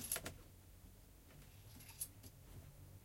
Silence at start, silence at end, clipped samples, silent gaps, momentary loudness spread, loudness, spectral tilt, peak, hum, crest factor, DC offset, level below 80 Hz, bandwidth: 0 s; 0 s; under 0.1%; none; 17 LU; -52 LUFS; -2.5 dB/octave; -26 dBFS; none; 28 dB; under 0.1%; -66 dBFS; 16.5 kHz